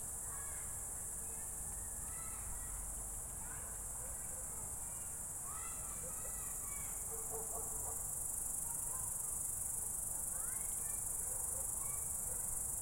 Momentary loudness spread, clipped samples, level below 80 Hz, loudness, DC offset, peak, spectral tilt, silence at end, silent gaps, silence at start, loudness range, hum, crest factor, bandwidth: 5 LU; under 0.1%; -56 dBFS; -40 LUFS; under 0.1%; -24 dBFS; -2 dB/octave; 0 s; none; 0 s; 4 LU; none; 18 dB; 16.5 kHz